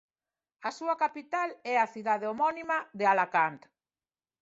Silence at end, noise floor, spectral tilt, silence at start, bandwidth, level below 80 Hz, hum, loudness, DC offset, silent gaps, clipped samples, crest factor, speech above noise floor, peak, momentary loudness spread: 0.85 s; under -90 dBFS; -4.5 dB/octave; 0.6 s; 8 kHz; -80 dBFS; none; -30 LUFS; under 0.1%; none; under 0.1%; 20 dB; over 60 dB; -12 dBFS; 7 LU